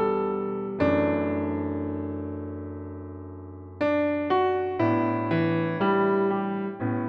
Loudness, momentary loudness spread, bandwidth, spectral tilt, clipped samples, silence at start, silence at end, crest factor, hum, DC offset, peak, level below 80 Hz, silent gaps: -26 LUFS; 15 LU; 6 kHz; -9.5 dB/octave; under 0.1%; 0 s; 0 s; 14 dB; none; under 0.1%; -12 dBFS; -60 dBFS; none